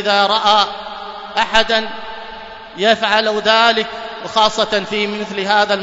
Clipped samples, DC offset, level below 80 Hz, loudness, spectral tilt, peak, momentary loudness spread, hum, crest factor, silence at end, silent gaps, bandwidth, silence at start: under 0.1%; under 0.1%; -48 dBFS; -15 LUFS; -2.5 dB/octave; 0 dBFS; 17 LU; none; 16 dB; 0 s; none; 8 kHz; 0 s